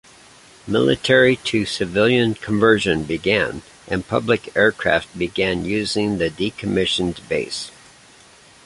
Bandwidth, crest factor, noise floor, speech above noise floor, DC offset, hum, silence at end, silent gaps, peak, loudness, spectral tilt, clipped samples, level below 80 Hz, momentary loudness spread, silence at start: 11.5 kHz; 18 dB; -48 dBFS; 29 dB; under 0.1%; none; 0.95 s; none; -2 dBFS; -19 LUFS; -5 dB/octave; under 0.1%; -46 dBFS; 10 LU; 0.65 s